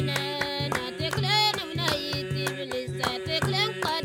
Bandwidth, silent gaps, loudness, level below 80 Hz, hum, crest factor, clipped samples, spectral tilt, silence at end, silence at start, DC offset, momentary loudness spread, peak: 17.5 kHz; none; -27 LUFS; -54 dBFS; none; 16 dB; under 0.1%; -4 dB/octave; 0 s; 0 s; under 0.1%; 7 LU; -12 dBFS